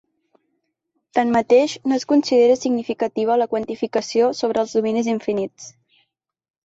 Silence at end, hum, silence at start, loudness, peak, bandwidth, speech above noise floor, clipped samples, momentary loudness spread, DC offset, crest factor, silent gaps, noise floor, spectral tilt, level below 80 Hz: 0.95 s; none; 1.15 s; -19 LUFS; -4 dBFS; 8 kHz; 55 dB; under 0.1%; 9 LU; under 0.1%; 16 dB; none; -74 dBFS; -4.5 dB/octave; -62 dBFS